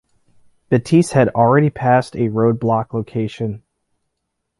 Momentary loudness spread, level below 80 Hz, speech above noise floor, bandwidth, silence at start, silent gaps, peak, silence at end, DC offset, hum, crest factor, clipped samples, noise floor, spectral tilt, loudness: 11 LU; -52 dBFS; 59 dB; 11.5 kHz; 0.7 s; none; -2 dBFS; 1 s; under 0.1%; none; 16 dB; under 0.1%; -75 dBFS; -7.5 dB/octave; -17 LUFS